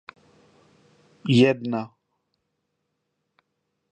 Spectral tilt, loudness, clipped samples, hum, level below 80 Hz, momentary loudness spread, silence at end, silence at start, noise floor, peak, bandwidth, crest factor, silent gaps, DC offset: -7 dB/octave; -22 LUFS; under 0.1%; none; -68 dBFS; 17 LU; 2.05 s; 1.25 s; -77 dBFS; -4 dBFS; 9 kHz; 24 dB; none; under 0.1%